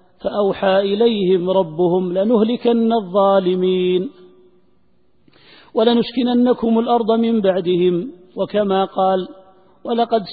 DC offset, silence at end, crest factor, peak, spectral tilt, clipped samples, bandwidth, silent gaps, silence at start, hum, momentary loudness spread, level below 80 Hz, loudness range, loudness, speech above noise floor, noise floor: 0.2%; 0 s; 16 dB; -2 dBFS; -11.5 dB/octave; under 0.1%; 4.9 kHz; none; 0.25 s; none; 8 LU; -58 dBFS; 3 LU; -17 LUFS; 45 dB; -61 dBFS